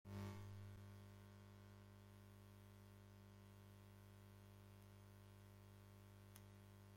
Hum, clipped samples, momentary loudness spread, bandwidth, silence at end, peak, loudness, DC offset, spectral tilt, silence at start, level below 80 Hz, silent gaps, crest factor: 50 Hz at -65 dBFS; under 0.1%; 7 LU; 16.5 kHz; 0 s; -36 dBFS; -63 LUFS; under 0.1%; -6 dB/octave; 0.05 s; -76 dBFS; none; 24 dB